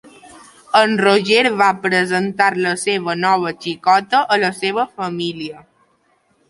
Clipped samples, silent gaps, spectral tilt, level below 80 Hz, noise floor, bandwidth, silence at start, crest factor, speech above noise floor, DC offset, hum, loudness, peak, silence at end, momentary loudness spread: under 0.1%; none; -4 dB/octave; -64 dBFS; -60 dBFS; 11.5 kHz; 0.25 s; 16 dB; 44 dB; under 0.1%; none; -16 LUFS; -2 dBFS; 0.9 s; 10 LU